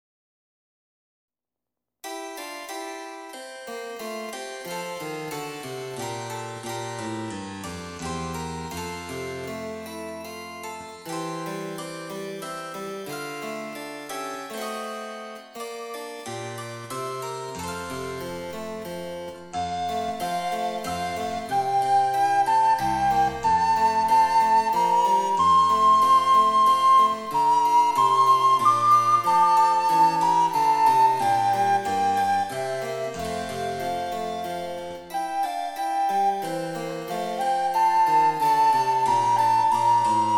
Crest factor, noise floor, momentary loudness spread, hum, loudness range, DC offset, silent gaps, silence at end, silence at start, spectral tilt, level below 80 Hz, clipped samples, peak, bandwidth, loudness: 16 dB; -89 dBFS; 17 LU; none; 15 LU; under 0.1%; none; 0 s; 2.05 s; -4 dB/octave; -58 dBFS; under 0.1%; -8 dBFS; 18 kHz; -23 LUFS